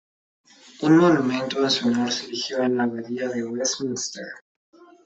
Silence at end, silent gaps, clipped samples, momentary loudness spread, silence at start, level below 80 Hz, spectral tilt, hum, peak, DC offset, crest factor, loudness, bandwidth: 0.2 s; 4.41-4.73 s; under 0.1%; 13 LU; 0.8 s; -66 dBFS; -4 dB/octave; none; -4 dBFS; under 0.1%; 20 dB; -22 LUFS; 8.2 kHz